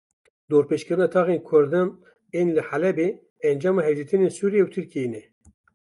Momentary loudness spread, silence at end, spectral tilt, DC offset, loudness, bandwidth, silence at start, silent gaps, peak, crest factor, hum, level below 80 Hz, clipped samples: 9 LU; 0.65 s; -7.5 dB/octave; under 0.1%; -23 LUFS; 11.5 kHz; 0.5 s; 3.30-3.36 s; -6 dBFS; 16 dB; none; -70 dBFS; under 0.1%